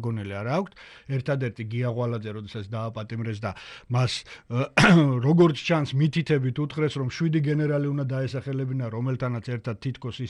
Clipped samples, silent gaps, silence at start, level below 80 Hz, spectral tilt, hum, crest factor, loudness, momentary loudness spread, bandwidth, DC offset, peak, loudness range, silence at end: under 0.1%; none; 0 s; -54 dBFS; -7 dB/octave; none; 22 dB; -25 LUFS; 13 LU; 11.5 kHz; under 0.1%; -4 dBFS; 8 LU; 0 s